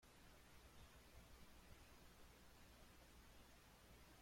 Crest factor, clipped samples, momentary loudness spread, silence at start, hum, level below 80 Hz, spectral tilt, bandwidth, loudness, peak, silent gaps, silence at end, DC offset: 16 dB; under 0.1%; 1 LU; 0 s; 60 Hz at -75 dBFS; -70 dBFS; -3.5 dB/octave; 16.5 kHz; -67 LUFS; -50 dBFS; none; 0 s; under 0.1%